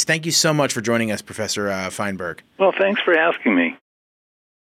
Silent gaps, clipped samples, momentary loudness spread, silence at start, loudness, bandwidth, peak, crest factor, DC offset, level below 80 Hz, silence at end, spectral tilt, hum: none; under 0.1%; 9 LU; 0 s; -19 LUFS; 16.5 kHz; -6 dBFS; 16 dB; under 0.1%; -64 dBFS; 0.95 s; -3.5 dB/octave; none